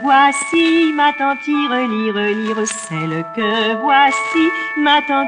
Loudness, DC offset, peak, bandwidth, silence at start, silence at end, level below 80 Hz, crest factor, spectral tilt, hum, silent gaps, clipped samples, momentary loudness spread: -15 LUFS; under 0.1%; -2 dBFS; 10.5 kHz; 0 s; 0 s; -64 dBFS; 14 dB; -3.5 dB/octave; none; none; under 0.1%; 8 LU